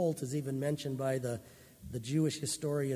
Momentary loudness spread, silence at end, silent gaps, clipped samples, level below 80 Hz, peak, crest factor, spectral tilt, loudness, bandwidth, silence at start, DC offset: 11 LU; 0 s; none; under 0.1%; -64 dBFS; -20 dBFS; 14 dB; -5.5 dB/octave; -35 LUFS; 16 kHz; 0 s; under 0.1%